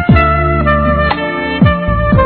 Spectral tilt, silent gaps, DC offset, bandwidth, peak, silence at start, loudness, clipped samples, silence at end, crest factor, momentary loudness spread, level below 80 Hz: -10 dB/octave; none; under 0.1%; 4.5 kHz; 0 dBFS; 0 s; -12 LUFS; under 0.1%; 0 s; 10 dB; 5 LU; -20 dBFS